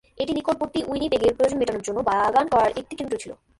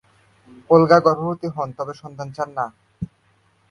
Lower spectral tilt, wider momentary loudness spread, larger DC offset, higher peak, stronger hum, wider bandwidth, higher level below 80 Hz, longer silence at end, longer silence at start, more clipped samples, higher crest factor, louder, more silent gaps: second, -4.5 dB/octave vs -7.5 dB/octave; second, 10 LU vs 21 LU; neither; second, -8 dBFS vs 0 dBFS; neither; first, 11.5 kHz vs 6.8 kHz; first, -50 dBFS vs -56 dBFS; second, 0.25 s vs 0.65 s; second, 0.15 s vs 0.7 s; neither; about the same, 16 dB vs 20 dB; second, -23 LUFS vs -19 LUFS; neither